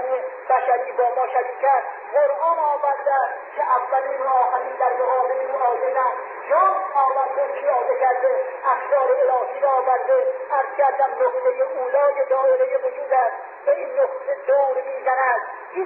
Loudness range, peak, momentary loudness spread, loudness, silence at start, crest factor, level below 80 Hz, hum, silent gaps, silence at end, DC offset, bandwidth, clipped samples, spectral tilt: 1 LU; -8 dBFS; 5 LU; -21 LUFS; 0 s; 12 dB; -78 dBFS; none; none; 0 s; under 0.1%; 3.6 kHz; under 0.1%; -0.5 dB/octave